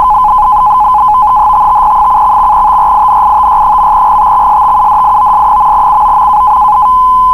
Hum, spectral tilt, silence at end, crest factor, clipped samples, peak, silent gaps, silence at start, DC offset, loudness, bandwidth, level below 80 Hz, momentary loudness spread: none; -5 dB/octave; 0 s; 6 dB; under 0.1%; 0 dBFS; none; 0 s; under 0.1%; -6 LUFS; 13 kHz; -28 dBFS; 0 LU